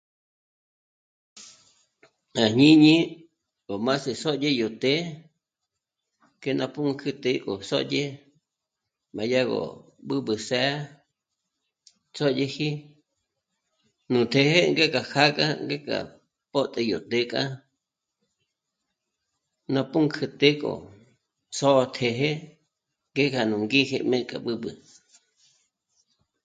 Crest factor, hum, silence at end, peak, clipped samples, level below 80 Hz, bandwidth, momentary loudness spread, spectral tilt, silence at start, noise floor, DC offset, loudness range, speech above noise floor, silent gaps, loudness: 24 dB; none; 1.7 s; -2 dBFS; under 0.1%; -68 dBFS; 9.2 kHz; 15 LU; -5 dB/octave; 1.35 s; -85 dBFS; under 0.1%; 8 LU; 61 dB; none; -24 LUFS